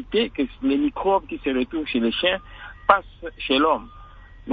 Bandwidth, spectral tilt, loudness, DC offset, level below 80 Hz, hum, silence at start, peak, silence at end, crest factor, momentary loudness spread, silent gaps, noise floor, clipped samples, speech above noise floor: 4.9 kHz; -7.5 dB/octave; -23 LUFS; under 0.1%; -46 dBFS; none; 0 s; 0 dBFS; 0 s; 22 dB; 10 LU; none; -44 dBFS; under 0.1%; 21 dB